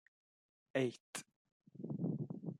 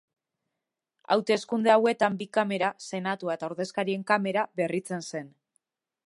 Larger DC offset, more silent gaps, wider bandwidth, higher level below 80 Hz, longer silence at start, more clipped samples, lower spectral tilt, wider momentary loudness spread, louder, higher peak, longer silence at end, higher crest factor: neither; first, 1.00-1.13 s, 1.36-1.45 s, 1.52-1.60 s vs none; first, 15 kHz vs 11.5 kHz; about the same, -84 dBFS vs -80 dBFS; second, 0.75 s vs 1.1 s; neither; about the same, -6 dB/octave vs -5 dB/octave; about the same, 12 LU vs 11 LU; second, -43 LUFS vs -27 LUFS; second, -22 dBFS vs -8 dBFS; second, 0 s vs 0.8 s; about the same, 22 dB vs 22 dB